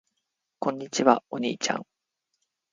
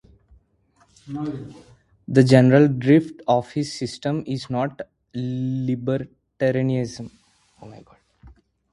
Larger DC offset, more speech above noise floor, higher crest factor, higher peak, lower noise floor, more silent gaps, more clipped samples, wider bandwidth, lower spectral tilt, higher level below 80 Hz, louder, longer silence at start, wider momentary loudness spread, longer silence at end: neither; first, 55 dB vs 41 dB; about the same, 26 dB vs 22 dB; second, -4 dBFS vs 0 dBFS; first, -81 dBFS vs -62 dBFS; neither; neither; second, 9.6 kHz vs 11.5 kHz; second, -3.5 dB/octave vs -7.5 dB/octave; second, -76 dBFS vs -56 dBFS; second, -26 LUFS vs -21 LUFS; second, 0.6 s vs 1.05 s; second, 9 LU vs 20 LU; first, 0.9 s vs 0.45 s